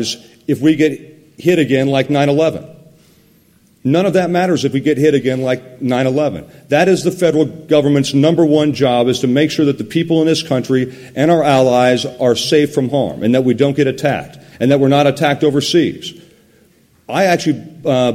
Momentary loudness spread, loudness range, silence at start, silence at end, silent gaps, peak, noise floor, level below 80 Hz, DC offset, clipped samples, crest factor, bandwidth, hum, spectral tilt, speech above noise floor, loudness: 8 LU; 3 LU; 0 s; 0 s; none; 0 dBFS; -51 dBFS; -54 dBFS; under 0.1%; under 0.1%; 14 dB; 15.5 kHz; none; -6 dB/octave; 38 dB; -14 LUFS